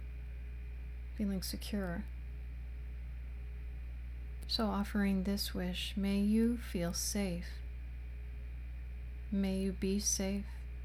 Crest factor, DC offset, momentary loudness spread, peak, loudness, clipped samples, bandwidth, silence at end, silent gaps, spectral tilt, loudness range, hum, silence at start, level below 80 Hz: 16 dB; under 0.1%; 14 LU; -22 dBFS; -38 LUFS; under 0.1%; 16 kHz; 0 s; none; -4.5 dB/octave; 7 LU; none; 0 s; -44 dBFS